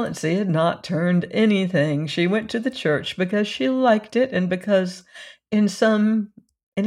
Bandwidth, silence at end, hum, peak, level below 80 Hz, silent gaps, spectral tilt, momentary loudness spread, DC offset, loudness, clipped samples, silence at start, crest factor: 12 kHz; 0 s; none; -6 dBFS; -64 dBFS; 6.63-6.72 s; -6.5 dB/octave; 7 LU; under 0.1%; -21 LUFS; under 0.1%; 0 s; 16 dB